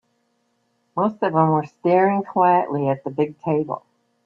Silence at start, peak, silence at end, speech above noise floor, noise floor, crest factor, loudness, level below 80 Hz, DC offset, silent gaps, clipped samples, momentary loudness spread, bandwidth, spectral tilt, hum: 0.95 s; -4 dBFS; 0.45 s; 49 dB; -68 dBFS; 18 dB; -20 LUFS; -68 dBFS; under 0.1%; none; under 0.1%; 7 LU; 6.6 kHz; -10 dB/octave; none